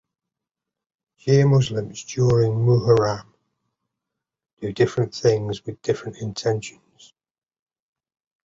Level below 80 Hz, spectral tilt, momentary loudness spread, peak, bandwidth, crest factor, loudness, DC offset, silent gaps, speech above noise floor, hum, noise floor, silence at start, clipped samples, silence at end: -52 dBFS; -6.5 dB/octave; 14 LU; -4 dBFS; 7.8 kHz; 18 dB; -21 LUFS; under 0.1%; 4.53-4.57 s; 66 dB; none; -86 dBFS; 1.25 s; under 0.1%; 1.75 s